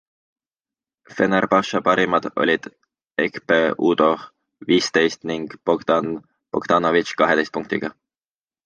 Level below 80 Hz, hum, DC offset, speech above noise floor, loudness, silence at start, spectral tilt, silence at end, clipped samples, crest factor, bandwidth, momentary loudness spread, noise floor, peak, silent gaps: -60 dBFS; none; under 0.1%; over 70 dB; -20 LUFS; 1.1 s; -5 dB/octave; 0.75 s; under 0.1%; 20 dB; 9.8 kHz; 11 LU; under -90 dBFS; -2 dBFS; none